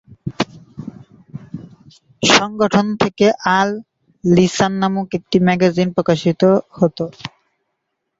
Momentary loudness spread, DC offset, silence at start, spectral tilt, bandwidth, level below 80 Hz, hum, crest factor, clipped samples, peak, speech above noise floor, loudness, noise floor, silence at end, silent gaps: 21 LU; under 0.1%; 0.1 s; -5 dB/octave; 8 kHz; -52 dBFS; none; 18 dB; under 0.1%; 0 dBFS; 59 dB; -16 LUFS; -74 dBFS; 0.9 s; none